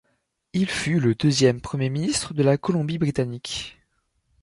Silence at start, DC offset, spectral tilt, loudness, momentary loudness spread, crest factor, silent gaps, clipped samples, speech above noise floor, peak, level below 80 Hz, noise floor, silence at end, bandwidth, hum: 0.55 s; under 0.1%; -5.5 dB/octave; -23 LUFS; 10 LU; 18 dB; none; under 0.1%; 49 dB; -6 dBFS; -52 dBFS; -72 dBFS; 0.7 s; 11.5 kHz; none